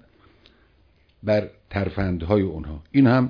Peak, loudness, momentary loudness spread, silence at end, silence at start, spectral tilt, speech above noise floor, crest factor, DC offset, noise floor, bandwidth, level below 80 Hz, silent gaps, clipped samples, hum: -6 dBFS; -23 LUFS; 13 LU; 0 s; 1.25 s; -10 dB/octave; 38 dB; 16 dB; under 0.1%; -59 dBFS; 5.2 kHz; -44 dBFS; none; under 0.1%; none